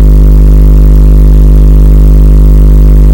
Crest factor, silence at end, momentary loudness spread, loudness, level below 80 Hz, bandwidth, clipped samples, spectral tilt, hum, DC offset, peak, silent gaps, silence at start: 2 dB; 0 s; 0 LU; -5 LUFS; -2 dBFS; 16.5 kHz; 60%; -9.5 dB/octave; 50 Hz at 0 dBFS; 5%; 0 dBFS; none; 0 s